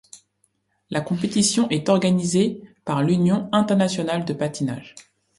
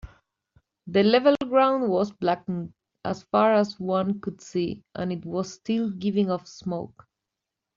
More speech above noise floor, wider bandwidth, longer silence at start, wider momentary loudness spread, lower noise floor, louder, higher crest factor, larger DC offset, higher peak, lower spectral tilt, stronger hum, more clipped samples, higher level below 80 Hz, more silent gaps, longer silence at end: second, 48 dB vs 61 dB; first, 11.5 kHz vs 7.6 kHz; about the same, 0.15 s vs 0.05 s; second, 9 LU vs 13 LU; second, -68 dBFS vs -86 dBFS; first, -21 LUFS vs -25 LUFS; about the same, 18 dB vs 18 dB; neither; about the same, -4 dBFS vs -6 dBFS; about the same, -5 dB/octave vs -5 dB/octave; neither; neither; about the same, -60 dBFS vs -58 dBFS; neither; second, 0.35 s vs 0.9 s